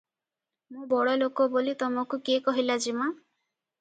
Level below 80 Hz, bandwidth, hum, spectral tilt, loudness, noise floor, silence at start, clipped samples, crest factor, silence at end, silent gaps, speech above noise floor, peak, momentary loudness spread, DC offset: -80 dBFS; 9.2 kHz; none; -3 dB/octave; -27 LUFS; -89 dBFS; 0.7 s; under 0.1%; 18 dB; 0.65 s; none; 62 dB; -12 dBFS; 7 LU; under 0.1%